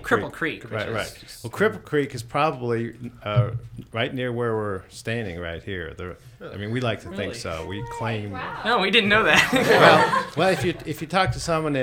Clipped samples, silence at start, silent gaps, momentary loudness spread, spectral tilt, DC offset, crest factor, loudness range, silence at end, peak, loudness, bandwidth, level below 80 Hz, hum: under 0.1%; 0 s; none; 17 LU; -5 dB/octave; under 0.1%; 22 dB; 12 LU; 0 s; 0 dBFS; -22 LUFS; 17 kHz; -48 dBFS; none